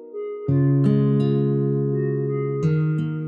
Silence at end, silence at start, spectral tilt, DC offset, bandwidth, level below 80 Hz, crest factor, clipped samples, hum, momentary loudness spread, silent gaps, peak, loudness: 0 s; 0 s; -11 dB/octave; under 0.1%; 4.1 kHz; -64 dBFS; 12 dB; under 0.1%; none; 6 LU; none; -8 dBFS; -21 LUFS